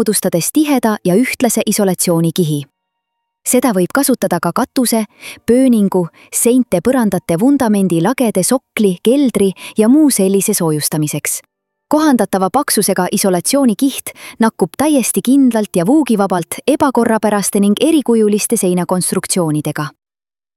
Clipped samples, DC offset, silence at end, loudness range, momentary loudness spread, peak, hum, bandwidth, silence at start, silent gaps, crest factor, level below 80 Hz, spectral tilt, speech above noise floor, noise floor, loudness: under 0.1%; under 0.1%; 0.65 s; 2 LU; 5 LU; 0 dBFS; none; 16.5 kHz; 0 s; none; 12 dB; -54 dBFS; -5 dB/octave; 61 dB; -74 dBFS; -13 LUFS